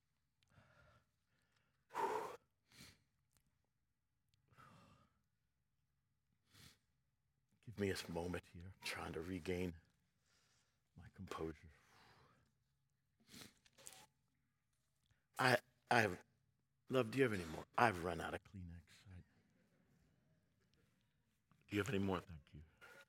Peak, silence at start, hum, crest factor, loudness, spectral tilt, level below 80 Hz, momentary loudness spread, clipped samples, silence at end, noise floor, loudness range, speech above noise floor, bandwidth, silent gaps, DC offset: -18 dBFS; 1.9 s; none; 30 dB; -42 LUFS; -5 dB/octave; -76 dBFS; 26 LU; under 0.1%; 0.05 s; -89 dBFS; 16 LU; 47 dB; 16.5 kHz; none; under 0.1%